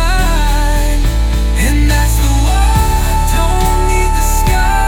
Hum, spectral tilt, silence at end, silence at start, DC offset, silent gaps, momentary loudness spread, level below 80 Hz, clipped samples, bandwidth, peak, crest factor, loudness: none; -4.5 dB/octave; 0 s; 0 s; under 0.1%; none; 3 LU; -12 dBFS; under 0.1%; 17 kHz; -2 dBFS; 10 dB; -13 LUFS